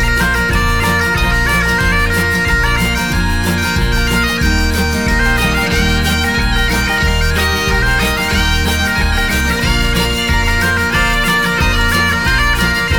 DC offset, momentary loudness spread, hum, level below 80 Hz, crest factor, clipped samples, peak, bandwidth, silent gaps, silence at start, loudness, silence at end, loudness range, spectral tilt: under 0.1%; 2 LU; none; -18 dBFS; 12 dB; under 0.1%; 0 dBFS; over 20 kHz; none; 0 s; -13 LUFS; 0 s; 1 LU; -4 dB/octave